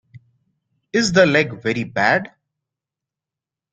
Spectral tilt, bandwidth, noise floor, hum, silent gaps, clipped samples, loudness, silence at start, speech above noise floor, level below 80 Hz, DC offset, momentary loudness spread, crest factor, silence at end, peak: -4.5 dB/octave; 9.4 kHz; -87 dBFS; none; none; under 0.1%; -18 LUFS; 0.95 s; 70 dB; -56 dBFS; under 0.1%; 9 LU; 20 dB; 1.45 s; -2 dBFS